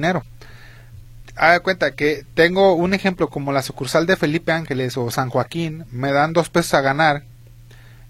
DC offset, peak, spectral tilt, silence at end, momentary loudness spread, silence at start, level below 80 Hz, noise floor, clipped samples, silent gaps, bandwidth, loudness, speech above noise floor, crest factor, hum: under 0.1%; 0 dBFS; -5.5 dB/octave; 0 s; 9 LU; 0 s; -46 dBFS; -43 dBFS; under 0.1%; none; 16 kHz; -19 LUFS; 25 dB; 20 dB; none